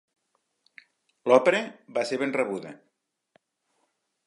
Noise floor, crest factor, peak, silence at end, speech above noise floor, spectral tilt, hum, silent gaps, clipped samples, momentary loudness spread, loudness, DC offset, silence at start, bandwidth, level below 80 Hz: -76 dBFS; 26 dB; -4 dBFS; 1.5 s; 51 dB; -4.5 dB/octave; none; none; under 0.1%; 15 LU; -25 LUFS; under 0.1%; 1.25 s; 11.5 kHz; -84 dBFS